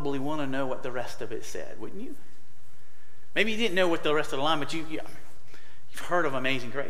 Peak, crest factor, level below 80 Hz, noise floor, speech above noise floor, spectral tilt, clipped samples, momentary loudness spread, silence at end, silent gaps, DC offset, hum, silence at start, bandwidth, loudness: -10 dBFS; 22 dB; -60 dBFS; -60 dBFS; 30 dB; -4.5 dB/octave; under 0.1%; 16 LU; 0 s; none; 6%; none; 0 s; 16 kHz; -29 LUFS